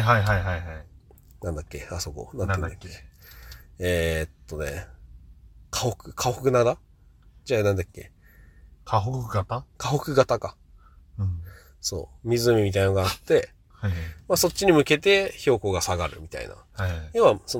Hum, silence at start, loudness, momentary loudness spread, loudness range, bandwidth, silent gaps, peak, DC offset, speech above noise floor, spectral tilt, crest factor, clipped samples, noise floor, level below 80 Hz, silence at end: none; 0 s; -25 LUFS; 17 LU; 8 LU; 18 kHz; none; -4 dBFS; under 0.1%; 30 dB; -5 dB/octave; 22 dB; under 0.1%; -54 dBFS; -46 dBFS; 0 s